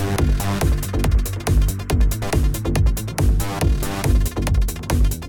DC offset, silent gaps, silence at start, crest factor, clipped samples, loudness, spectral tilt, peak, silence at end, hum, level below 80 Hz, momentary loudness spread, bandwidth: under 0.1%; none; 0 s; 12 dB; under 0.1%; -21 LUFS; -5.5 dB/octave; -6 dBFS; 0 s; none; -20 dBFS; 1 LU; 19 kHz